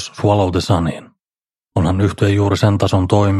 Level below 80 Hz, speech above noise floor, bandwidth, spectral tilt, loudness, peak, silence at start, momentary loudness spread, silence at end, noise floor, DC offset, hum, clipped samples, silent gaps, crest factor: -38 dBFS; over 76 dB; 12 kHz; -7 dB/octave; -16 LUFS; -2 dBFS; 0 s; 7 LU; 0 s; under -90 dBFS; under 0.1%; none; under 0.1%; none; 14 dB